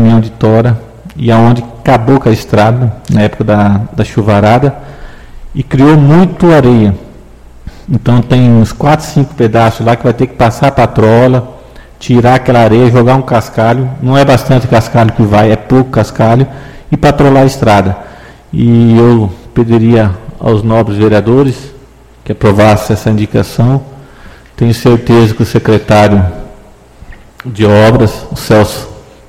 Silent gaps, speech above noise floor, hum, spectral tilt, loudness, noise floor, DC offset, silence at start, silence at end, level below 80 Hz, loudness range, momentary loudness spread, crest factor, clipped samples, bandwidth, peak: none; 29 dB; none; -7.5 dB/octave; -8 LUFS; -36 dBFS; 0.8%; 0 s; 0.3 s; -30 dBFS; 2 LU; 10 LU; 8 dB; 1%; 15 kHz; 0 dBFS